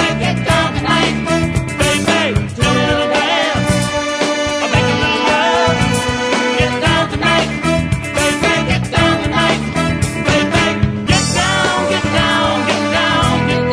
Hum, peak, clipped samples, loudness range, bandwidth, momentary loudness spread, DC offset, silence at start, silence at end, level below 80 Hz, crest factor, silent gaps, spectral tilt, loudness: none; 0 dBFS; under 0.1%; 1 LU; 11 kHz; 3 LU; under 0.1%; 0 s; 0 s; -30 dBFS; 14 dB; none; -4.5 dB/octave; -14 LUFS